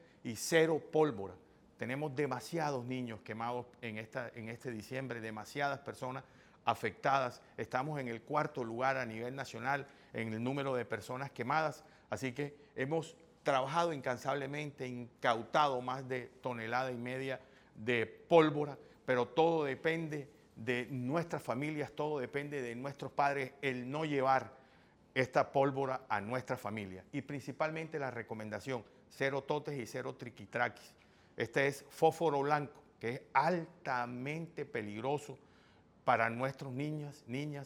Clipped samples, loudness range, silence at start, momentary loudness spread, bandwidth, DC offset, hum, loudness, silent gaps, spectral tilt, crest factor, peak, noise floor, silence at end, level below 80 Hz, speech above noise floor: under 0.1%; 6 LU; 0.25 s; 12 LU; 17 kHz; under 0.1%; none; -37 LUFS; none; -5.5 dB/octave; 24 dB; -12 dBFS; -65 dBFS; 0 s; -76 dBFS; 28 dB